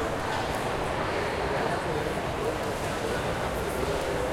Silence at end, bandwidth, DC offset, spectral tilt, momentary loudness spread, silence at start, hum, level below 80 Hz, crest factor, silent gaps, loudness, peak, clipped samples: 0 s; 16.5 kHz; under 0.1%; -5 dB/octave; 2 LU; 0 s; none; -42 dBFS; 14 dB; none; -29 LUFS; -14 dBFS; under 0.1%